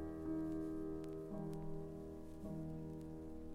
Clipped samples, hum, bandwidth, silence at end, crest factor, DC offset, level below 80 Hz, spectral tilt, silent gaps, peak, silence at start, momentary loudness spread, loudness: under 0.1%; none; 15.5 kHz; 0 s; 12 dB; under 0.1%; -56 dBFS; -9 dB/octave; none; -34 dBFS; 0 s; 8 LU; -47 LUFS